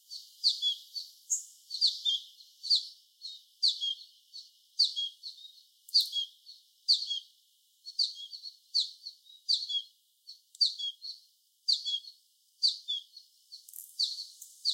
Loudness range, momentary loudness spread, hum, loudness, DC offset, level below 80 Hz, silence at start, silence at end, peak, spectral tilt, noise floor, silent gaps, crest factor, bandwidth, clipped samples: 2 LU; 21 LU; none; -30 LUFS; under 0.1%; under -90 dBFS; 0.1 s; 0 s; -14 dBFS; 10 dB/octave; -68 dBFS; none; 22 dB; 16.5 kHz; under 0.1%